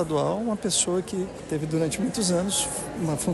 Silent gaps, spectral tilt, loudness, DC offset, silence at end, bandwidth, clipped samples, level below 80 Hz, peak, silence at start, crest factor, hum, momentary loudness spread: none; -4 dB/octave; -26 LUFS; under 0.1%; 0 s; 12.5 kHz; under 0.1%; -50 dBFS; -10 dBFS; 0 s; 16 dB; none; 8 LU